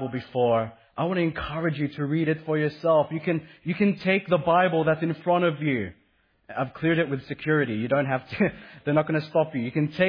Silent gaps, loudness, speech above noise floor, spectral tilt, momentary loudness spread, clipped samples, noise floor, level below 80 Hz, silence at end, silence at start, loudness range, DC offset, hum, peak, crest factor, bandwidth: none; -25 LUFS; 41 dB; -9.5 dB/octave; 8 LU; under 0.1%; -66 dBFS; -56 dBFS; 0 s; 0 s; 3 LU; under 0.1%; none; -8 dBFS; 16 dB; 5.2 kHz